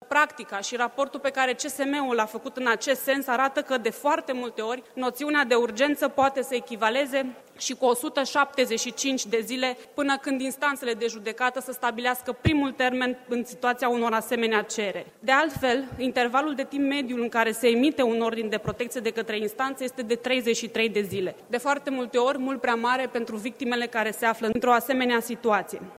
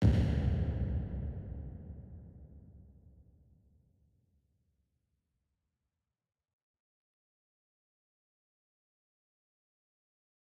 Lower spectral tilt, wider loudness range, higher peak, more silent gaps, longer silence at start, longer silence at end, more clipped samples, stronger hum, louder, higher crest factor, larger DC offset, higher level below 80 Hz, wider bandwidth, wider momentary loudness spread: second, -3.5 dB/octave vs -9 dB/octave; second, 2 LU vs 24 LU; first, -6 dBFS vs -16 dBFS; neither; about the same, 0 s vs 0 s; second, 0.05 s vs 7.65 s; neither; neither; first, -26 LUFS vs -35 LUFS; about the same, 20 dB vs 24 dB; neither; second, -58 dBFS vs -44 dBFS; first, 16 kHz vs 7.2 kHz; second, 8 LU vs 24 LU